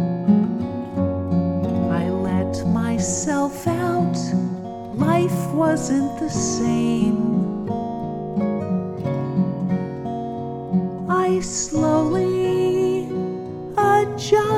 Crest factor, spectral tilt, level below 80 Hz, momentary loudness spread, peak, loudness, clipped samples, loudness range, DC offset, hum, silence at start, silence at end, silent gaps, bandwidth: 16 dB; -6 dB/octave; -48 dBFS; 8 LU; -4 dBFS; -22 LUFS; under 0.1%; 3 LU; under 0.1%; none; 0 s; 0 s; none; 15.5 kHz